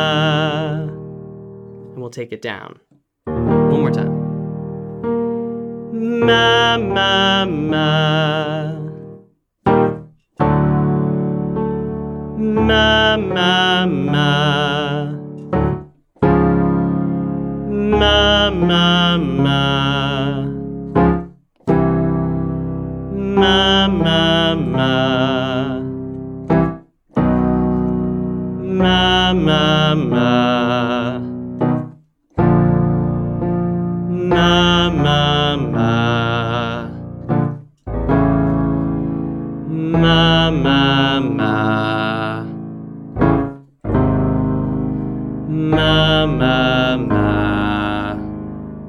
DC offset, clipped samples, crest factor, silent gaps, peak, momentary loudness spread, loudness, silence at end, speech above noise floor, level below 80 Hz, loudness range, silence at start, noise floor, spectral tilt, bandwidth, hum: under 0.1%; under 0.1%; 16 dB; none; 0 dBFS; 14 LU; -16 LUFS; 0 s; 34 dB; -34 dBFS; 4 LU; 0 s; -49 dBFS; -6.5 dB/octave; 10.5 kHz; none